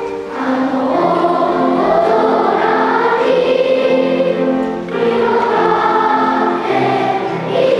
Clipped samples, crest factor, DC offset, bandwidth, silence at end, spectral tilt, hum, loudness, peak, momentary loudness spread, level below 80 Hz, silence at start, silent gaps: under 0.1%; 14 dB; under 0.1%; 10.5 kHz; 0 s; -6.5 dB/octave; none; -14 LUFS; 0 dBFS; 4 LU; -52 dBFS; 0 s; none